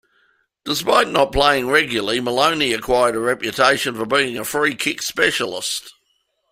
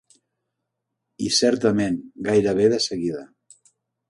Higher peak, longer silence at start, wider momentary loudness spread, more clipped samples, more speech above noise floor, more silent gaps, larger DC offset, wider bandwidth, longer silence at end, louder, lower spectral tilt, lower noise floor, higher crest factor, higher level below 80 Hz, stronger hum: first, 0 dBFS vs -6 dBFS; second, 0.65 s vs 1.2 s; second, 7 LU vs 11 LU; neither; second, 49 dB vs 59 dB; neither; neither; first, 16 kHz vs 11.5 kHz; second, 0.6 s vs 0.85 s; first, -18 LUFS vs -21 LUFS; second, -2.5 dB/octave vs -4 dB/octave; second, -67 dBFS vs -80 dBFS; about the same, 18 dB vs 18 dB; first, -42 dBFS vs -58 dBFS; neither